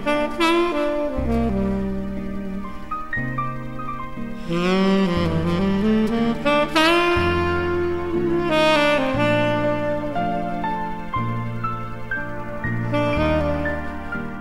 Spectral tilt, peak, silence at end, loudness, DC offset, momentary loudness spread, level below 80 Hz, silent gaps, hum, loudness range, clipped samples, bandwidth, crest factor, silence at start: -6.5 dB/octave; -4 dBFS; 0 s; -22 LUFS; 2%; 12 LU; -36 dBFS; none; none; 7 LU; under 0.1%; 15 kHz; 18 dB; 0 s